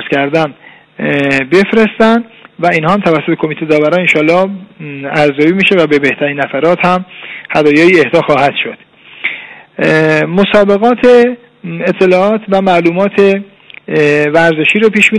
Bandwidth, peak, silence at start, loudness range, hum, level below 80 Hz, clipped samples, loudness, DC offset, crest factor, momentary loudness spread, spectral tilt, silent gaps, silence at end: 11 kHz; 0 dBFS; 0 s; 2 LU; none; -48 dBFS; 0.3%; -10 LUFS; under 0.1%; 10 dB; 11 LU; -6 dB/octave; none; 0 s